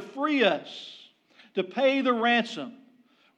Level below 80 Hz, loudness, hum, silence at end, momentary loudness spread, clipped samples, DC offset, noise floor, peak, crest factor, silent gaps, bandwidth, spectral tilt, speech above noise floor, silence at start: under -90 dBFS; -25 LUFS; none; 0.6 s; 18 LU; under 0.1%; under 0.1%; -61 dBFS; -10 dBFS; 18 dB; none; 9.4 kHz; -4.5 dB/octave; 36 dB; 0 s